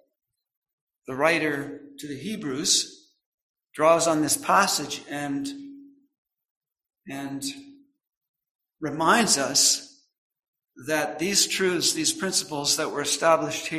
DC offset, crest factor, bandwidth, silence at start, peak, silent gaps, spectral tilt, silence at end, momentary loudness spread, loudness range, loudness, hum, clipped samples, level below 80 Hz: under 0.1%; 22 dB; 16 kHz; 1.1 s; -4 dBFS; 3.26-3.54 s, 6.18-6.25 s, 6.51-6.61 s, 8.17-8.21 s, 8.29-8.34 s, 8.51-8.59 s, 10.18-10.30 s, 10.48-10.53 s; -2 dB/octave; 0 s; 16 LU; 13 LU; -23 LUFS; none; under 0.1%; -68 dBFS